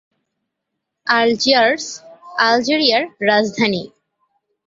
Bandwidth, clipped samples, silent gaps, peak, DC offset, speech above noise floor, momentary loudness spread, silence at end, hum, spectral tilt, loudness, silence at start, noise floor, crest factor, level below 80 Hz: 7.8 kHz; under 0.1%; none; 0 dBFS; under 0.1%; 62 dB; 14 LU; 0.8 s; none; -3 dB/octave; -16 LUFS; 1.05 s; -78 dBFS; 18 dB; -62 dBFS